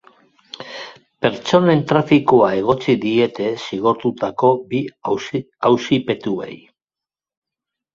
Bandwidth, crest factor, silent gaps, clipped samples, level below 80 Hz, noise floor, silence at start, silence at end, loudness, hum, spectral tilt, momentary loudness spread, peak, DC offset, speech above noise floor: 7.4 kHz; 18 dB; none; under 0.1%; -56 dBFS; -90 dBFS; 0.6 s; 1.4 s; -18 LUFS; none; -6.5 dB/octave; 18 LU; 0 dBFS; under 0.1%; 73 dB